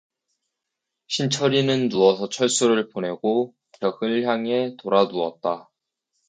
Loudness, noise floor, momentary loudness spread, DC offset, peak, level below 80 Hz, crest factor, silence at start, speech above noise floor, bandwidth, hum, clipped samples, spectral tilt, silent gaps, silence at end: -22 LUFS; -83 dBFS; 9 LU; under 0.1%; -4 dBFS; -70 dBFS; 20 dB; 1.1 s; 61 dB; 9.6 kHz; none; under 0.1%; -4.5 dB/octave; none; 0.65 s